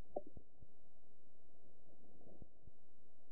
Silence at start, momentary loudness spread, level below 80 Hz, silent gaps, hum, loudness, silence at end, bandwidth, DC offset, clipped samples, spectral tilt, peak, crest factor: 0 s; 15 LU; -72 dBFS; none; none; -59 LUFS; 0 s; 0.9 kHz; 0.9%; under 0.1%; 0.5 dB/octave; -26 dBFS; 28 dB